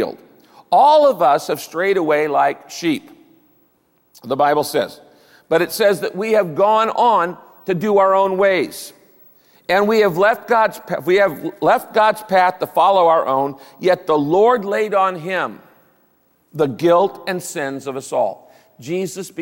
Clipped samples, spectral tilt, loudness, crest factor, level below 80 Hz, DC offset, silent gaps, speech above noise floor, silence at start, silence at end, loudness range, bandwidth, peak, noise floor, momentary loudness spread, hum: under 0.1%; -5 dB/octave; -17 LUFS; 14 dB; -66 dBFS; under 0.1%; none; 44 dB; 0 s; 0 s; 5 LU; 17 kHz; -4 dBFS; -60 dBFS; 11 LU; none